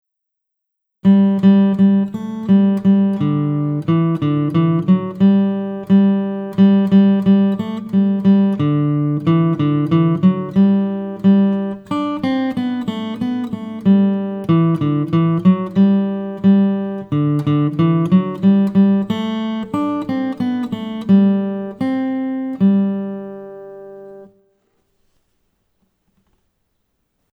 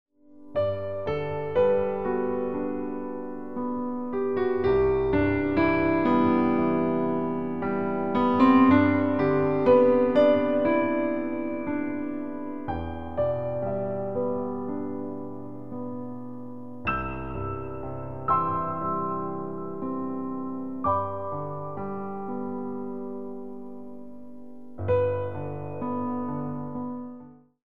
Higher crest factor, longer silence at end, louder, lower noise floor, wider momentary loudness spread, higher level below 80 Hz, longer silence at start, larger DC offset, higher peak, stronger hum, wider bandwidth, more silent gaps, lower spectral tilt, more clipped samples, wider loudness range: about the same, 14 dB vs 18 dB; first, 3.1 s vs 0.05 s; first, -16 LUFS vs -26 LUFS; first, -78 dBFS vs -47 dBFS; second, 10 LU vs 16 LU; second, -58 dBFS vs -50 dBFS; first, 1.05 s vs 0.05 s; second, under 0.1% vs 0.9%; first, -2 dBFS vs -8 dBFS; neither; second, 4.7 kHz vs 5.4 kHz; neither; about the same, -10 dB/octave vs -9.5 dB/octave; neither; second, 4 LU vs 11 LU